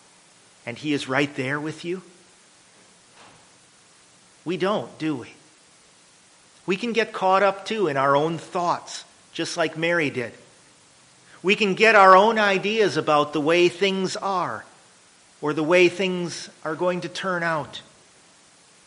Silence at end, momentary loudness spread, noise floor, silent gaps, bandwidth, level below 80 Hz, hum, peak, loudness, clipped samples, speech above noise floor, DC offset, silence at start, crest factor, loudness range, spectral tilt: 1.05 s; 16 LU; -54 dBFS; none; 10.5 kHz; -70 dBFS; none; -2 dBFS; -22 LUFS; under 0.1%; 33 dB; under 0.1%; 0.65 s; 22 dB; 14 LU; -4.5 dB/octave